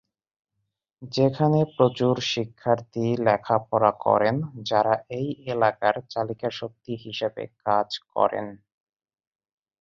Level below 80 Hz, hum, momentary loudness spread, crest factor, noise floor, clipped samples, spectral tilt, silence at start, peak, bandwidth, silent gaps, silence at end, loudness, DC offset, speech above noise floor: -64 dBFS; none; 10 LU; 22 dB; -80 dBFS; under 0.1%; -6.5 dB/octave; 1 s; -4 dBFS; 7.4 kHz; none; 1.25 s; -24 LUFS; under 0.1%; 56 dB